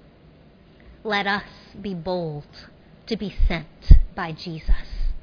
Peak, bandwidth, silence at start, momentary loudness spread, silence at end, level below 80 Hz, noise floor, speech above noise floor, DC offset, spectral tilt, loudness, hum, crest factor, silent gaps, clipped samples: 0 dBFS; 5.4 kHz; 1.05 s; 19 LU; 0.05 s; -22 dBFS; -51 dBFS; 31 dB; under 0.1%; -7.5 dB/octave; -25 LUFS; none; 22 dB; none; under 0.1%